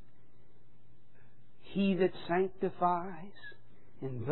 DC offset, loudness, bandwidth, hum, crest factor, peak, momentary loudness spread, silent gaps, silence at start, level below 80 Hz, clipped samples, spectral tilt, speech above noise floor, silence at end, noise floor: 0.8%; -34 LUFS; 4.2 kHz; none; 20 dB; -16 dBFS; 19 LU; none; 1.65 s; -66 dBFS; under 0.1%; -6 dB/octave; 33 dB; 0 s; -65 dBFS